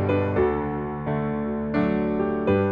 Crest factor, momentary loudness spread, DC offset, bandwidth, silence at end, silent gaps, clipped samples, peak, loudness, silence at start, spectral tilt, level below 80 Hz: 14 dB; 5 LU; under 0.1%; 5.2 kHz; 0 s; none; under 0.1%; -10 dBFS; -25 LUFS; 0 s; -10.5 dB/octave; -42 dBFS